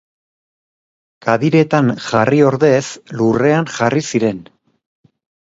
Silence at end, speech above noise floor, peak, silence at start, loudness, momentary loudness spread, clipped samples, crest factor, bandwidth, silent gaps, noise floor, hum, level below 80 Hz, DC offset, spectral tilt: 1 s; over 76 dB; 0 dBFS; 1.25 s; -15 LUFS; 8 LU; under 0.1%; 16 dB; 8 kHz; none; under -90 dBFS; none; -56 dBFS; under 0.1%; -6 dB/octave